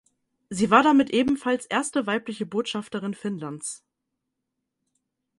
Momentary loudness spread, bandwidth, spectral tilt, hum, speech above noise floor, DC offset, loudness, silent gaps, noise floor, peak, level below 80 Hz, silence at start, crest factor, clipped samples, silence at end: 15 LU; 11.5 kHz; -4.5 dB/octave; none; 58 dB; under 0.1%; -24 LUFS; none; -82 dBFS; -4 dBFS; -62 dBFS; 0.5 s; 22 dB; under 0.1%; 1.65 s